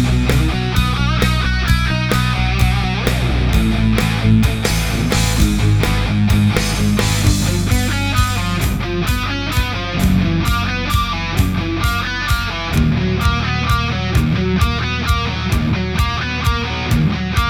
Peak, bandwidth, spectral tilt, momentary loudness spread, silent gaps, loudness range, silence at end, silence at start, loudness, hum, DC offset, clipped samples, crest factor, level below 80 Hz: 0 dBFS; 19.5 kHz; -5 dB/octave; 4 LU; none; 2 LU; 0 s; 0 s; -17 LUFS; none; under 0.1%; under 0.1%; 16 dB; -22 dBFS